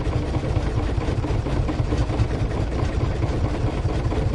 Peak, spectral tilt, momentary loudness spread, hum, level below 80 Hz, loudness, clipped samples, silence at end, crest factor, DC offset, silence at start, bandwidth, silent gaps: -8 dBFS; -7.5 dB/octave; 1 LU; none; -26 dBFS; -24 LUFS; under 0.1%; 0 s; 14 dB; under 0.1%; 0 s; 11 kHz; none